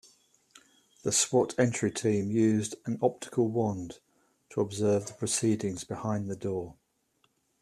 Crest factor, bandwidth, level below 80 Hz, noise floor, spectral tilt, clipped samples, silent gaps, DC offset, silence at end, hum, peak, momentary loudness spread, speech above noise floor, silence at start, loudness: 20 dB; 13.5 kHz; -66 dBFS; -73 dBFS; -5 dB/octave; under 0.1%; none; under 0.1%; 0.9 s; none; -12 dBFS; 10 LU; 44 dB; 1.05 s; -29 LUFS